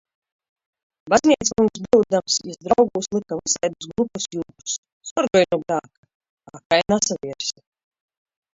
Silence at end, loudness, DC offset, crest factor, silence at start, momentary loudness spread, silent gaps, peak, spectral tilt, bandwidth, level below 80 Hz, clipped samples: 1.05 s; -21 LUFS; under 0.1%; 20 dB; 1.05 s; 11 LU; 4.78-4.83 s, 4.92-5.01 s, 5.11-5.16 s, 5.98-6.03 s, 6.15-6.20 s, 6.30-6.37 s, 6.65-6.70 s; -2 dBFS; -3.5 dB/octave; 8 kHz; -56 dBFS; under 0.1%